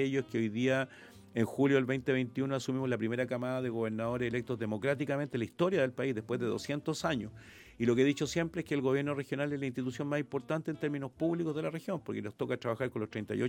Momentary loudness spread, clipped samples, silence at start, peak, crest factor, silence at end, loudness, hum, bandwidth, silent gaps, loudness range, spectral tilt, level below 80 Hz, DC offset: 7 LU; under 0.1%; 0 s; -16 dBFS; 18 dB; 0 s; -34 LUFS; none; 16.5 kHz; none; 3 LU; -6.5 dB/octave; -66 dBFS; under 0.1%